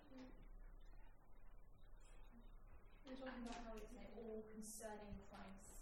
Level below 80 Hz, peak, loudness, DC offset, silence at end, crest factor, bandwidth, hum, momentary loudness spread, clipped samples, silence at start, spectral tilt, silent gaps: -62 dBFS; -40 dBFS; -57 LUFS; under 0.1%; 0 s; 16 dB; 16.5 kHz; none; 15 LU; under 0.1%; 0 s; -4.5 dB/octave; none